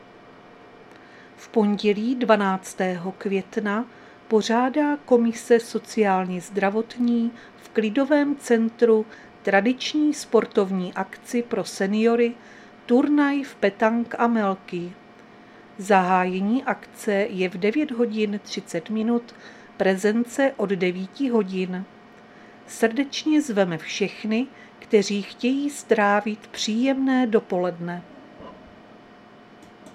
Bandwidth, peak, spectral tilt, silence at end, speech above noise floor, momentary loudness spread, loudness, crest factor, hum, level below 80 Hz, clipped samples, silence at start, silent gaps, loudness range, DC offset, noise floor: 14 kHz; -2 dBFS; -5.5 dB/octave; 0.05 s; 26 dB; 10 LU; -23 LUFS; 20 dB; none; -70 dBFS; under 0.1%; 0.25 s; none; 3 LU; under 0.1%; -48 dBFS